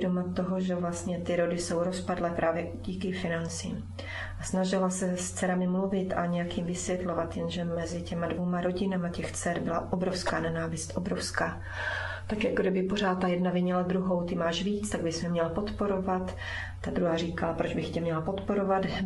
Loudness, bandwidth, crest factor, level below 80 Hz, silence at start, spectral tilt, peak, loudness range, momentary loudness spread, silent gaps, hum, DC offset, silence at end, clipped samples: -31 LUFS; 12 kHz; 18 dB; -48 dBFS; 0 s; -5.5 dB/octave; -12 dBFS; 3 LU; 6 LU; none; none; under 0.1%; 0 s; under 0.1%